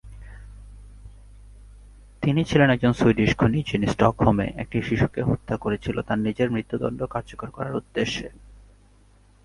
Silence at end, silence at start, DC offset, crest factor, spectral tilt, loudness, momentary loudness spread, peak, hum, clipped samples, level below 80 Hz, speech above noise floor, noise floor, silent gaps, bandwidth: 0.9 s; 0.05 s; under 0.1%; 22 dB; -7 dB/octave; -23 LUFS; 13 LU; -2 dBFS; 50 Hz at -40 dBFS; under 0.1%; -42 dBFS; 32 dB; -55 dBFS; none; 11.5 kHz